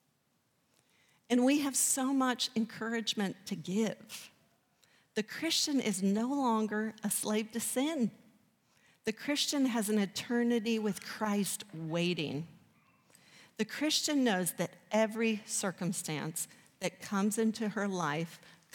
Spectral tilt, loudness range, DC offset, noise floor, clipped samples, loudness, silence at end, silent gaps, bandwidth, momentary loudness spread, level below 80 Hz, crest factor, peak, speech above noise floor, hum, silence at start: -3.5 dB/octave; 3 LU; under 0.1%; -76 dBFS; under 0.1%; -33 LUFS; 0.25 s; none; 19 kHz; 10 LU; -82 dBFS; 18 dB; -16 dBFS; 43 dB; none; 1.3 s